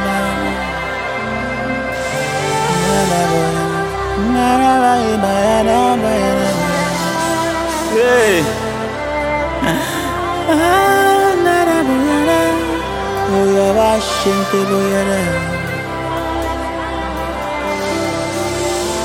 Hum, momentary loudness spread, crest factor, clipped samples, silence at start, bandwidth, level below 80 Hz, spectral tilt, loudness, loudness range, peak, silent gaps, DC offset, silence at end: none; 8 LU; 14 dB; under 0.1%; 0 s; 16.5 kHz; -34 dBFS; -4.5 dB/octave; -15 LUFS; 5 LU; 0 dBFS; none; under 0.1%; 0 s